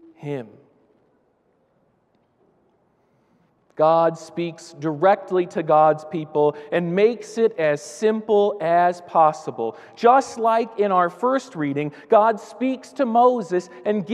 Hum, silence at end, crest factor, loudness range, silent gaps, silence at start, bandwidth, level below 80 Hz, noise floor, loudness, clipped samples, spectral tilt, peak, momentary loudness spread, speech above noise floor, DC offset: none; 0 s; 18 dB; 6 LU; none; 0.2 s; 11.5 kHz; -76 dBFS; -64 dBFS; -20 LUFS; under 0.1%; -6 dB/octave; -4 dBFS; 12 LU; 44 dB; under 0.1%